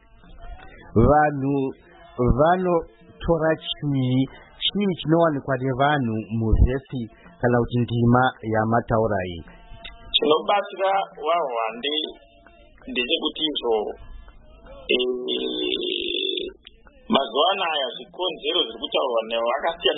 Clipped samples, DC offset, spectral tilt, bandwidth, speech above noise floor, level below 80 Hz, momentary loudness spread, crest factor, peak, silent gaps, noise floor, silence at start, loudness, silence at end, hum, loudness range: under 0.1%; under 0.1%; -10.5 dB/octave; 4.1 kHz; 29 dB; -36 dBFS; 10 LU; 20 dB; -4 dBFS; none; -51 dBFS; 0.3 s; -23 LUFS; 0 s; none; 3 LU